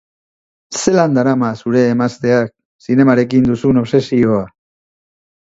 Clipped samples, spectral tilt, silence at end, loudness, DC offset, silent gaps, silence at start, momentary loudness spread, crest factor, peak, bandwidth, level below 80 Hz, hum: under 0.1%; -6.5 dB/octave; 1 s; -14 LUFS; under 0.1%; 2.65-2.79 s; 0.7 s; 8 LU; 14 dB; 0 dBFS; 8 kHz; -48 dBFS; none